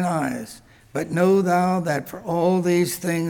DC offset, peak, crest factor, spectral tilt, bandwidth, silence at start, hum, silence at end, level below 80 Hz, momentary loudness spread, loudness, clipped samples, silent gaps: under 0.1%; -8 dBFS; 14 dB; -6 dB/octave; 19 kHz; 0 s; none; 0 s; -58 dBFS; 12 LU; -21 LUFS; under 0.1%; none